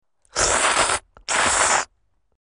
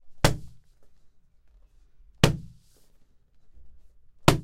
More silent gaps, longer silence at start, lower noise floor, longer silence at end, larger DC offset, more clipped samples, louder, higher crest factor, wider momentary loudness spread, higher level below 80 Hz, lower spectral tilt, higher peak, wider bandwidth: neither; first, 0.35 s vs 0.05 s; first, -67 dBFS vs -57 dBFS; first, 0.55 s vs 0 s; neither; neither; first, -19 LUFS vs -26 LUFS; second, 18 dB vs 28 dB; second, 10 LU vs 13 LU; about the same, -44 dBFS vs -42 dBFS; second, 0 dB/octave vs -5 dB/octave; about the same, -4 dBFS vs -2 dBFS; second, 10.5 kHz vs 16 kHz